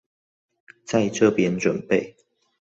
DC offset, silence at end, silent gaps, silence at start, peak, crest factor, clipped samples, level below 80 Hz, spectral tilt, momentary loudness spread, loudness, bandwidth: under 0.1%; 0.6 s; none; 0.9 s; -4 dBFS; 20 dB; under 0.1%; -60 dBFS; -5.5 dB/octave; 6 LU; -22 LUFS; 8 kHz